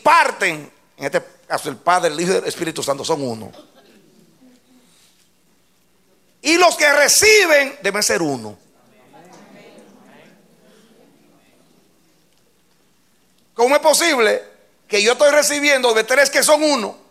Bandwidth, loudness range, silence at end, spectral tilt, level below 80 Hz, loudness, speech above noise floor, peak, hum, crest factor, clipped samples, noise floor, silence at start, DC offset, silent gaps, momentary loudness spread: 16 kHz; 13 LU; 0.15 s; -1.5 dB/octave; -62 dBFS; -15 LUFS; 44 dB; 0 dBFS; none; 18 dB; under 0.1%; -60 dBFS; 0.05 s; under 0.1%; none; 14 LU